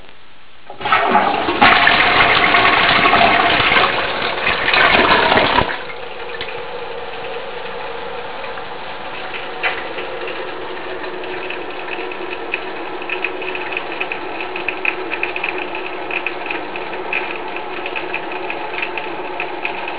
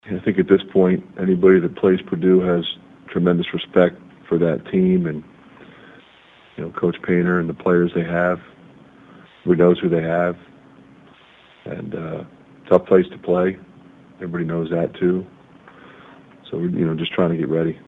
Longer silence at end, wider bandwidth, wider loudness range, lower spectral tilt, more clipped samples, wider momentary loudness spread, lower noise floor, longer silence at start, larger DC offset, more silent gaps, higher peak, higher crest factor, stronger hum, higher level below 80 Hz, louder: about the same, 0 s vs 0.1 s; about the same, 4 kHz vs 4 kHz; first, 14 LU vs 6 LU; second, -7 dB/octave vs -9.5 dB/octave; neither; about the same, 16 LU vs 16 LU; second, -45 dBFS vs -50 dBFS; about the same, 0 s vs 0.05 s; first, 3% vs under 0.1%; neither; about the same, 0 dBFS vs 0 dBFS; about the same, 18 dB vs 20 dB; neither; first, -44 dBFS vs -54 dBFS; about the same, -17 LUFS vs -19 LUFS